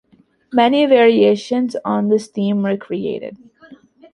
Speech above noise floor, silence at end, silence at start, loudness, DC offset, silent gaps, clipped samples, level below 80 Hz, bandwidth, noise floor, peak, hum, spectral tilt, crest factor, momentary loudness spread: 30 dB; 0.4 s; 0.5 s; -16 LUFS; under 0.1%; none; under 0.1%; -64 dBFS; 11 kHz; -45 dBFS; -2 dBFS; none; -6.5 dB/octave; 16 dB; 12 LU